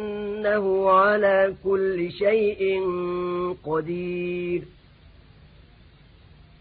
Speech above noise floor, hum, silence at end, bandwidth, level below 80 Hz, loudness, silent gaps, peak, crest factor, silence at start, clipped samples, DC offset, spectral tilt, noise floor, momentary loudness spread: 29 dB; none; 1.95 s; 4.8 kHz; -54 dBFS; -23 LUFS; none; -6 dBFS; 18 dB; 0 s; under 0.1%; under 0.1%; -10.5 dB/octave; -52 dBFS; 10 LU